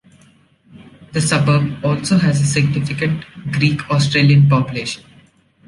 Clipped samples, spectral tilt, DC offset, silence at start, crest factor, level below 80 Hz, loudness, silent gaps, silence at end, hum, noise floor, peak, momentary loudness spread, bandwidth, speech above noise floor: under 0.1%; -5.5 dB/octave; under 0.1%; 0.75 s; 16 dB; -48 dBFS; -16 LUFS; none; 0.7 s; none; -51 dBFS; -2 dBFS; 12 LU; 11.5 kHz; 36 dB